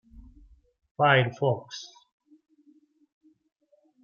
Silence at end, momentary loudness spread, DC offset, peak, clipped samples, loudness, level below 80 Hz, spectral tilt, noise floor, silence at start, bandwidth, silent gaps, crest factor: 2.15 s; 24 LU; under 0.1%; -8 dBFS; under 0.1%; -24 LUFS; -60 dBFS; -5.5 dB/octave; -62 dBFS; 1 s; 7 kHz; none; 24 dB